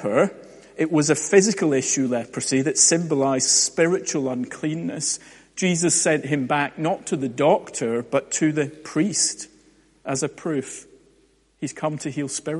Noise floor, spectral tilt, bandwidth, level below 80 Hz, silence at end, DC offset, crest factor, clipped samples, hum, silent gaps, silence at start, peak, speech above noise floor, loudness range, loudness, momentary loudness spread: -60 dBFS; -3.5 dB/octave; 11.5 kHz; -66 dBFS; 0 s; under 0.1%; 20 dB; under 0.1%; none; none; 0 s; -2 dBFS; 38 dB; 7 LU; -21 LUFS; 11 LU